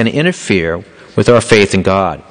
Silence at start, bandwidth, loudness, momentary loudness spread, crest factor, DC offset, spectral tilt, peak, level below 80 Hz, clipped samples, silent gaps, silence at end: 0 s; 10 kHz; -12 LUFS; 11 LU; 12 dB; under 0.1%; -5 dB/octave; 0 dBFS; -36 dBFS; 0.3%; none; 0.1 s